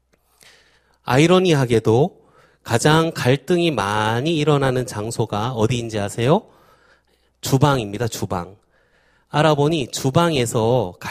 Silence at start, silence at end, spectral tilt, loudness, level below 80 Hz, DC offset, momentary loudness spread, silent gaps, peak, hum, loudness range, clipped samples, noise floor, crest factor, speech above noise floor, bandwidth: 1.05 s; 0 s; -5.5 dB/octave; -19 LUFS; -48 dBFS; under 0.1%; 9 LU; none; 0 dBFS; none; 5 LU; under 0.1%; -60 dBFS; 20 dB; 42 dB; 15.5 kHz